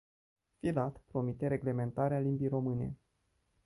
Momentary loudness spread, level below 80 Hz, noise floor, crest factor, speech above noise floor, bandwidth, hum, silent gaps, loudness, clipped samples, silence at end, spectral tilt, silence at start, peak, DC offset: 6 LU; -62 dBFS; -78 dBFS; 16 dB; 44 dB; 11.5 kHz; none; none; -35 LUFS; under 0.1%; 0.7 s; -10 dB/octave; 0.65 s; -20 dBFS; under 0.1%